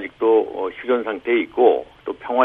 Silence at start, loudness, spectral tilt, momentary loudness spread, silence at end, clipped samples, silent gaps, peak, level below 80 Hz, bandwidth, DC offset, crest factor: 0 s; -20 LUFS; -7 dB/octave; 10 LU; 0 s; under 0.1%; none; -2 dBFS; -60 dBFS; 3.9 kHz; under 0.1%; 18 dB